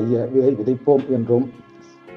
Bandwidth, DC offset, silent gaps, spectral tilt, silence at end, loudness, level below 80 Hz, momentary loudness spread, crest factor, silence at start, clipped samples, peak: 6.2 kHz; under 0.1%; none; -10.5 dB/octave; 0 s; -19 LUFS; -64 dBFS; 3 LU; 16 dB; 0 s; under 0.1%; -4 dBFS